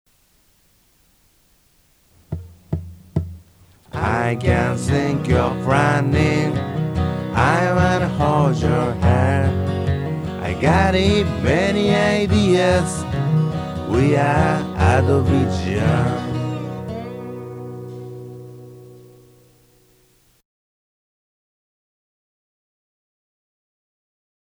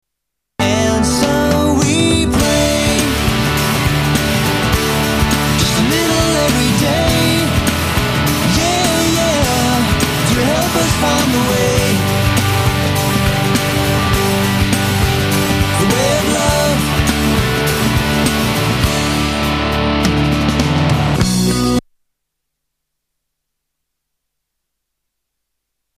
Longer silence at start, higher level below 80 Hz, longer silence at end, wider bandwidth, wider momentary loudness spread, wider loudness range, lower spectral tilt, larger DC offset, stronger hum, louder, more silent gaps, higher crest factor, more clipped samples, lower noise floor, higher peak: first, 2.3 s vs 0.6 s; second, -36 dBFS vs -26 dBFS; first, 5.55 s vs 4.15 s; second, 12 kHz vs 15.5 kHz; first, 17 LU vs 2 LU; first, 16 LU vs 2 LU; first, -6.5 dB/octave vs -4.5 dB/octave; neither; neither; second, -19 LUFS vs -14 LUFS; neither; about the same, 18 dB vs 14 dB; neither; second, -58 dBFS vs -77 dBFS; about the same, -2 dBFS vs -2 dBFS